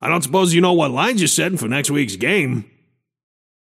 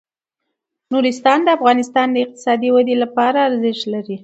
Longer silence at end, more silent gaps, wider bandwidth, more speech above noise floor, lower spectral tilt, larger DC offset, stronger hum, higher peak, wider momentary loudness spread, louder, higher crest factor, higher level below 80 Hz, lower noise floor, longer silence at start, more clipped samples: first, 1 s vs 0.05 s; neither; first, 16 kHz vs 8.2 kHz; second, 46 dB vs 62 dB; about the same, -4 dB/octave vs -4.5 dB/octave; neither; neither; about the same, -2 dBFS vs 0 dBFS; about the same, 5 LU vs 6 LU; about the same, -17 LUFS vs -16 LUFS; about the same, 16 dB vs 16 dB; first, -64 dBFS vs -72 dBFS; second, -63 dBFS vs -78 dBFS; second, 0 s vs 0.9 s; neither